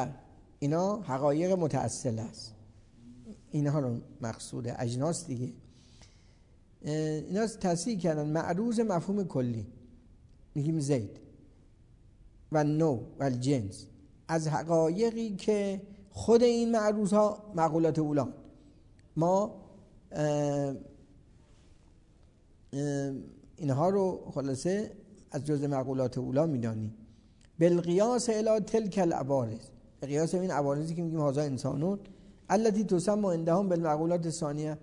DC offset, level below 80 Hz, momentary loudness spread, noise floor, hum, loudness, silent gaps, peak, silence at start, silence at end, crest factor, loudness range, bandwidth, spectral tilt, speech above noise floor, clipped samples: under 0.1%; -60 dBFS; 13 LU; -60 dBFS; none; -30 LUFS; none; -12 dBFS; 0 s; 0.05 s; 20 dB; 7 LU; 11 kHz; -6.5 dB/octave; 30 dB; under 0.1%